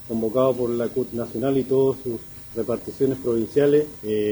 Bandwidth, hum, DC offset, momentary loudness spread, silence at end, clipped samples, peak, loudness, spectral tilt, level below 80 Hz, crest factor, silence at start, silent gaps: over 20 kHz; none; under 0.1%; 10 LU; 0 s; under 0.1%; -8 dBFS; -23 LUFS; -7.5 dB/octave; -54 dBFS; 16 dB; 0 s; none